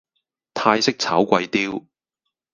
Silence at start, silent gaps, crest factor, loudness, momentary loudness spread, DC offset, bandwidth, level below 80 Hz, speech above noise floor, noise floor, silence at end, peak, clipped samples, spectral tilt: 0.55 s; none; 22 dB; -20 LUFS; 12 LU; under 0.1%; 10 kHz; -62 dBFS; 61 dB; -81 dBFS; 0.75 s; 0 dBFS; under 0.1%; -4 dB/octave